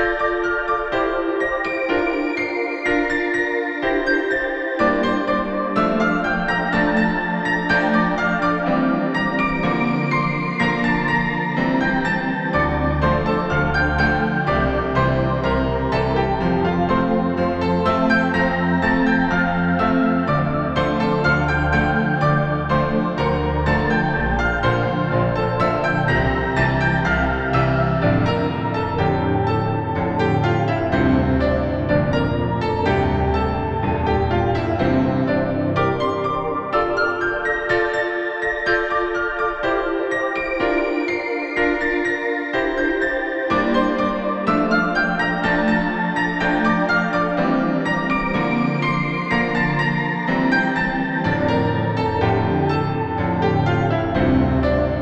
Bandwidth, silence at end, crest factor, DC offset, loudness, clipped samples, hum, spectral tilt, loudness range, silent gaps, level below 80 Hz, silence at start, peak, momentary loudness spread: 8.4 kHz; 0 s; 14 dB; under 0.1%; -19 LUFS; under 0.1%; none; -7.5 dB/octave; 2 LU; none; -34 dBFS; 0 s; -6 dBFS; 3 LU